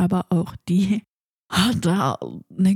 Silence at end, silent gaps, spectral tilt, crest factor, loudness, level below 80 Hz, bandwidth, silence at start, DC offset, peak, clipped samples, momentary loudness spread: 0 s; 1.08-1.49 s; -6 dB/octave; 16 dB; -22 LUFS; -52 dBFS; 16 kHz; 0 s; under 0.1%; -4 dBFS; under 0.1%; 7 LU